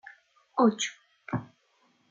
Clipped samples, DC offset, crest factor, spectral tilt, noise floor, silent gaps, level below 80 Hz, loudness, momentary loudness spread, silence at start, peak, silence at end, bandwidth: under 0.1%; under 0.1%; 22 dB; -4.5 dB/octave; -68 dBFS; none; -70 dBFS; -29 LUFS; 11 LU; 0.55 s; -10 dBFS; 0.65 s; 9.4 kHz